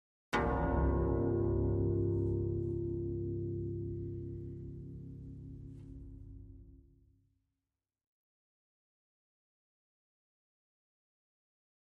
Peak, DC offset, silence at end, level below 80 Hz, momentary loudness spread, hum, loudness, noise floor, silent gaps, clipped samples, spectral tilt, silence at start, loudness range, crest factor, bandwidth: -20 dBFS; under 0.1%; 5.05 s; -46 dBFS; 18 LU; none; -36 LUFS; under -90 dBFS; none; under 0.1%; -9 dB/octave; 0.3 s; 21 LU; 18 dB; 8.2 kHz